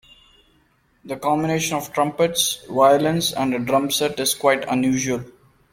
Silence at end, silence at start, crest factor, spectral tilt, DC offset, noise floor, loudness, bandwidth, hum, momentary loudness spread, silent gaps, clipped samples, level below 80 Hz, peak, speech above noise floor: 0.4 s; 1.05 s; 18 dB; -3.5 dB/octave; under 0.1%; -61 dBFS; -20 LUFS; 16.5 kHz; none; 7 LU; none; under 0.1%; -56 dBFS; -2 dBFS; 41 dB